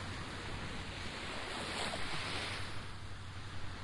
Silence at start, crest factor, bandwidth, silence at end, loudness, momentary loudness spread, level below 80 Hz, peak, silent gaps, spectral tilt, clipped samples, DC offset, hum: 0 s; 16 dB; 11.5 kHz; 0 s; -42 LUFS; 9 LU; -54 dBFS; -26 dBFS; none; -3.5 dB/octave; under 0.1%; under 0.1%; none